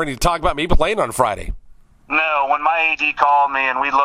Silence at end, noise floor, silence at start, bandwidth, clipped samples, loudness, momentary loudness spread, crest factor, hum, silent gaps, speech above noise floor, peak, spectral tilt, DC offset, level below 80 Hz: 0 s; -44 dBFS; 0 s; 16 kHz; under 0.1%; -17 LUFS; 6 LU; 18 dB; none; none; 28 dB; 0 dBFS; -4 dB/octave; under 0.1%; -28 dBFS